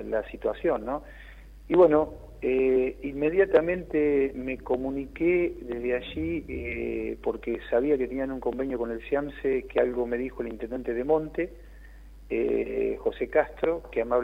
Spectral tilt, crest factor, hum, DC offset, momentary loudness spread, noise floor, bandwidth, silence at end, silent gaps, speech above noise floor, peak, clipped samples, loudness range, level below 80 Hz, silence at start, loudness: -8 dB/octave; 18 dB; none; under 0.1%; 10 LU; -47 dBFS; 5.2 kHz; 0 s; none; 20 dB; -8 dBFS; under 0.1%; 5 LU; -46 dBFS; 0 s; -27 LUFS